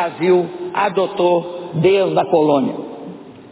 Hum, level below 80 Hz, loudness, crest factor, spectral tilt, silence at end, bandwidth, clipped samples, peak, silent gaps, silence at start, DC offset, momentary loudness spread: none; -58 dBFS; -17 LUFS; 14 dB; -11 dB/octave; 0.05 s; 4 kHz; under 0.1%; -2 dBFS; none; 0 s; under 0.1%; 17 LU